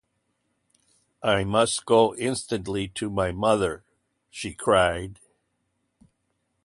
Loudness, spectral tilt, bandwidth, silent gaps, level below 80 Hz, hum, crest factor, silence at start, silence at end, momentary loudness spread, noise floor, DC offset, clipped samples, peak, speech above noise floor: -24 LUFS; -4.5 dB/octave; 11.5 kHz; none; -50 dBFS; 60 Hz at -60 dBFS; 22 dB; 1.2 s; 1.5 s; 14 LU; -75 dBFS; under 0.1%; under 0.1%; -6 dBFS; 51 dB